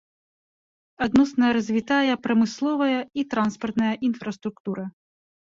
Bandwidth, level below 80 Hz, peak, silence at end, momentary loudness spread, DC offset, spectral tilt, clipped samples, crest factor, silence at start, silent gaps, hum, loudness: 7.6 kHz; -60 dBFS; -8 dBFS; 0.65 s; 11 LU; under 0.1%; -5.5 dB/octave; under 0.1%; 16 dB; 1 s; 4.60-4.65 s; none; -24 LUFS